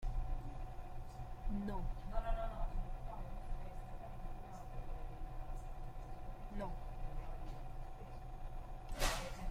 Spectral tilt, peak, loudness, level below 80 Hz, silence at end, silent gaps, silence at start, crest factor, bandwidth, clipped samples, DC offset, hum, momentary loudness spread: -5 dB/octave; -22 dBFS; -48 LUFS; -44 dBFS; 0 s; none; 0 s; 20 dB; 15.5 kHz; under 0.1%; under 0.1%; none; 9 LU